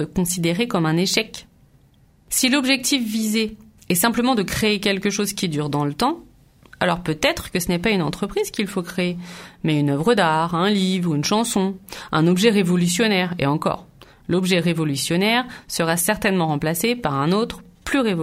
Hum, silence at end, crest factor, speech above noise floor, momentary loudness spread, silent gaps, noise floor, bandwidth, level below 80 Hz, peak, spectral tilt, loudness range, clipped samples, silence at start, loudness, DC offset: none; 0 s; 20 dB; 34 dB; 7 LU; none; -55 dBFS; 16 kHz; -48 dBFS; -2 dBFS; -4.5 dB/octave; 3 LU; under 0.1%; 0 s; -20 LUFS; under 0.1%